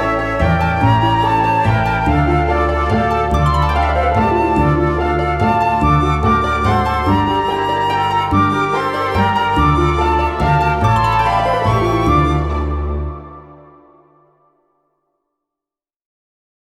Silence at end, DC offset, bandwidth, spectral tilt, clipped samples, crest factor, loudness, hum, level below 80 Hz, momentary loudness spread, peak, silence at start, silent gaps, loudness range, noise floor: 3.15 s; under 0.1%; 12.5 kHz; -7 dB/octave; under 0.1%; 14 dB; -15 LUFS; none; -24 dBFS; 3 LU; -2 dBFS; 0 s; none; 5 LU; -88 dBFS